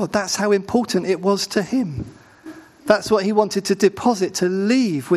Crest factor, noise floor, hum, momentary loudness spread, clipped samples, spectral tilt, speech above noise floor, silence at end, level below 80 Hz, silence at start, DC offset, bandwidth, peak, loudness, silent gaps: 20 dB; -41 dBFS; none; 6 LU; under 0.1%; -4.5 dB/octave; 22 dB; 0 s; -54 dBFS; 0 s; under 0.1%; 13 kHz; 0 dBFS; -19 LUFS; none